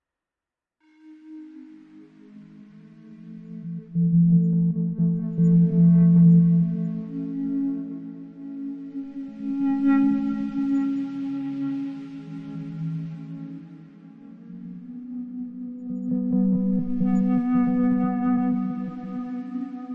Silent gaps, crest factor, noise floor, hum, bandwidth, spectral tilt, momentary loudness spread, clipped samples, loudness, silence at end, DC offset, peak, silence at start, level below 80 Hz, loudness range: none; 16 dB; -89 dBFS; none; 3.2 kHz; -11.5 dB/octave; 21 LU; under 0.1%; -23 LUFS; 0 s; under 0.1%; -8 dBFS; 1.05 s; -58 dBFS; 16 LU